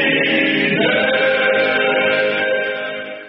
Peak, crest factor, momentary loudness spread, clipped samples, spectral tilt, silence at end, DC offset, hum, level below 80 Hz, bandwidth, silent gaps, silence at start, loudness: -2 dBFS; 14 dB; 6 LU; under 0.1%; -1.5 dB/octave; 0 s; under 0.1%; none; -58 dBFS; 5.6 kHz; none; 0 s; -15 LUFS